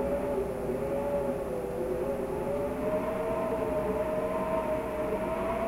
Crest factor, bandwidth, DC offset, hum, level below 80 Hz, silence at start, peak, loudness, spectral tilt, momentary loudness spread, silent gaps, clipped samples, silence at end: 12 dB; 16 kHz; under 0.1%; none; -46 dBFS; 0 s; -18 dBFS; -31 LUFS; -7 dB/octave; 2 LU; none; under 0.1%; 0 s